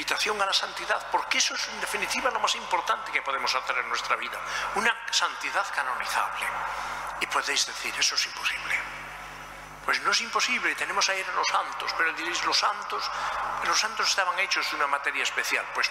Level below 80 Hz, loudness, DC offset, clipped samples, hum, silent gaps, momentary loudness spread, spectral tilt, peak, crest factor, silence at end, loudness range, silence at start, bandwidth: -60 dBFS; -26 LUFS; under 0.1%; under 0.1%; 50 Hz at -60 dBFS; none; 6 LU; 0.5 dB/octave; -8 dBFS; 20 dB; 0 s; 2 LU; 0 s; 16 kHz